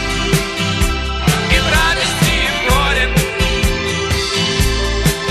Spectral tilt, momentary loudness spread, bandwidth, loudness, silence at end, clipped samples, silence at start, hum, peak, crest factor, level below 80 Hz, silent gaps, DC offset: -3.5 dB/octave; 4 LU; 15.5 kHz; -15 LUFS; 0 s; under 0.1%; 0 s; none; 0 dBFS; 16 dB; -22 dBFS; none; under 0.1%